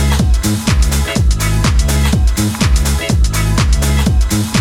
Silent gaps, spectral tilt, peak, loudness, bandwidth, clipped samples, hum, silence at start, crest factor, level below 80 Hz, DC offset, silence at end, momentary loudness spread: none; -4.5 dB/octave; 0 dBFS; -14 LUFS; 17 kHz; under 0.1%; none; 0 s; 12 dB; -14 dBFS; under 0.1%; 0 s; 1 LU